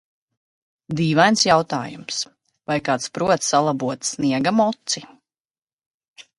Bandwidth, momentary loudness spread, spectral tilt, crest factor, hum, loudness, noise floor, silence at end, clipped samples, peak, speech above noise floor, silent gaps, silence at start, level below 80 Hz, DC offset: 11.5 kHz; 11 LU; -4 dB/octave; 22 dB; none; -20 LUFS; under -90 dBFS; 0.2 s; under 0.1%; 0 dBFS; over 70 dB; 5.40-5.45 s, 5.62-5.67 s, 5.73-5.78 s, 5.86-6.01 s, 6.08-6.14 s; 0.9 s; -60 dBFS; under 0.1%